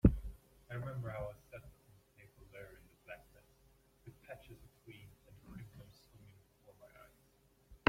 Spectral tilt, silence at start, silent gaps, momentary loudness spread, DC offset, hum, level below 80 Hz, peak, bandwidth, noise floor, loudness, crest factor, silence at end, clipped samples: -8 dB/octave; 0.05 s; none; 21 LU; under 0.1%; none; -50 dBFS; -12 dBFS; 16 kHz; -71 dBFS; -46 LUFS; 30 dB; 0.15 s; under 0.1%